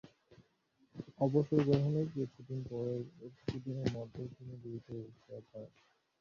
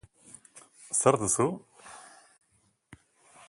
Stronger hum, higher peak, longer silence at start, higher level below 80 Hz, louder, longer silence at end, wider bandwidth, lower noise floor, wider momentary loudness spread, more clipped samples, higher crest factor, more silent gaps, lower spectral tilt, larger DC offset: neither; second, -16 dBFS vs -6 dBFS; second, 0.05 s vs 0.55 s; about the same, -66 dBFS vs -64 dBFS; second, -37 LUFS vs -26 LUFS; about the same, 0.55 s vs 0.55 s; second, 7.2 kHz vs 11.5 kHz; about the same, -74 dBFS vs -71 dBFS; second, 21 LU vs 26 LU; neither; about the same, 22 dB vs 26 dB; neither; first, -8.5 dB/octave vs -4.5 dB/octave; neither